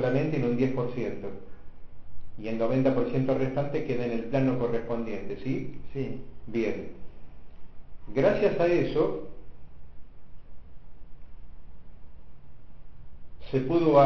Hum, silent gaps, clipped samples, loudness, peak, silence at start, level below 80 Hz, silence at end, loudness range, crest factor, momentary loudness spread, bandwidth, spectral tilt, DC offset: none; none; under 0.1%; -28 LUFS; -8 dBFS; 0 s; -50 dBFS; 0 s; 7 LU; 20 dB; 15 LU; 6.6 kHz; -9 dB/octave; 2%